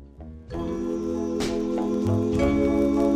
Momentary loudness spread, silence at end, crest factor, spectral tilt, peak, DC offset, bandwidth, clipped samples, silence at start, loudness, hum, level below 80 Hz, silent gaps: 12 LU; 0 s; 14 dB; -7 dB/octave; -10 dBFS; under 0.1%; 14.5 kHz; under 0.1%; 0 s; -25 LUFS; none; -40 dBFS; none